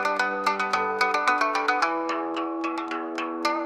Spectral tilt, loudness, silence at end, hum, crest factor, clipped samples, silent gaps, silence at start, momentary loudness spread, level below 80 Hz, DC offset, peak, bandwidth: -3 dB/octave; -25 LUFS; 0 s; none; 18 dB; under 0.1%; none; 0 s; 7 LU; -76 dBFS; under 0.1%; -8 dBFS; 14.5 kHz